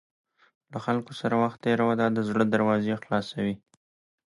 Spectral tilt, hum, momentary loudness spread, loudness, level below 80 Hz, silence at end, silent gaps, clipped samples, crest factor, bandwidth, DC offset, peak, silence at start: -7 dB/octave; none; 8 LU; -26 LUFS; -64 dBFS; 0.7 s; none; under 0.1%; 18 dB; 11 kHz; under 0.1%; -8 dBFS; 0.7 s